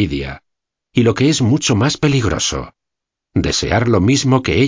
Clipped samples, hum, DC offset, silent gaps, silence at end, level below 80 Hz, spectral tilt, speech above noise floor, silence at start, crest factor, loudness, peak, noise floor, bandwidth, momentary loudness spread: under 0.1%; none; under 0.1%; none; 0 s; -34 dBFS; -5 dB/octave; 67 dB; 0 s; 16 dB; -15 LUFS; 0 dBFS; -81 dBFS; 7.6 kHz; 10 LU